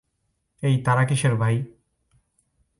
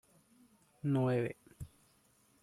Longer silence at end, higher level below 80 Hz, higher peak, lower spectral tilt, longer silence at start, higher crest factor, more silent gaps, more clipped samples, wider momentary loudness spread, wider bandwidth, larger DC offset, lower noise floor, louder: first, 1.1 s vs 0.75 s; first, -58 dBFS vs -66 dBFS; first, -8 dBFS vs -22 dBFS; second, -6 dB/octave vs -8.5 dB/octave; second, 0.6 s vs 0.85 s; about the same, 16 dB vs 16 dB; neither; neither; second, 8 LU vs 21 LU; second, 11.5 kHz vs 13.5 kHz; neither; first, -74 dBFS vs -70 dBFS; first, -22 LUFS vs -35 LUFS